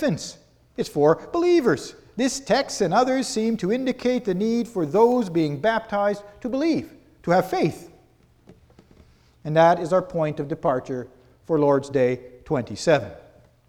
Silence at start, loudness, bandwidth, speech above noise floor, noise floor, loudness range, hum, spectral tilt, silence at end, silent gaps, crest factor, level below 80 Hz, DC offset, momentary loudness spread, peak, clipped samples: 0 s; -23 LUFS; 17.5 kHz; 35 dB; -57 dBFS; 3 LU; none; -5.5 dB/octave; 0.5 s; none; 18 dB; -56 dBFS; under 0.1%; 13 LU; -4 dBFS; under 0.1%